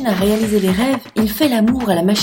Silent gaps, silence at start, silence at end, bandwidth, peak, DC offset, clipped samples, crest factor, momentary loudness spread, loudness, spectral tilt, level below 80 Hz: none; 0 s; 0 s; 17 kHz; -2 dBFS; under 0.1%; under 0.1%; 14 dB; 3 LU; -16 LUFS; -5.5 dB/octave; -40 dBFS